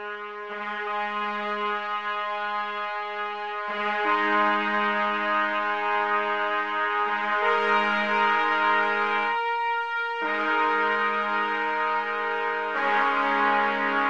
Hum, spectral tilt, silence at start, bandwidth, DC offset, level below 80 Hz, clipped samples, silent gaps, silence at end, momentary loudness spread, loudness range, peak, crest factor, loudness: none; -4.5 dB/octave; 0 s; 8.2 kHz; 0.2%; -74 dBFS; under 0.1%; none; 0 s; 8 LU; 5 LU; -8 dBFS; 16 dB; -25 LUFS